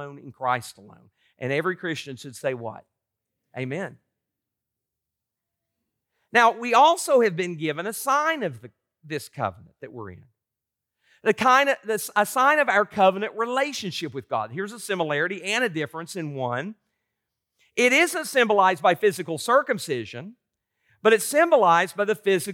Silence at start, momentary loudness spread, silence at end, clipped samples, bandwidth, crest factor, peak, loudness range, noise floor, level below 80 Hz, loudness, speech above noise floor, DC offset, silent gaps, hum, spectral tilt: 0 s; 16 LU; 0 s; under 0.1%; 17.5 kHz; 20 dB; -6 dBFS; 10 LU; -86 dBFS; -76 dBFS; -23 LUFS; 63 dB; under 0.1%; none; none; -3.5 dB/octave